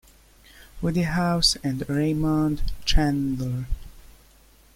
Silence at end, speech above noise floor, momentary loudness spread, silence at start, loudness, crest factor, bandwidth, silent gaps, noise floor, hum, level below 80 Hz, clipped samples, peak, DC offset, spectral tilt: 0.7 s; 32 dB; 10 LU; 0.75 s; -24 LUFS; 20 dB; 16.5 kHz; none; -54 dBFS; none; -32 dBFS; under 0.1%; -6 dBFS; under 0.1%; -5 dB/octave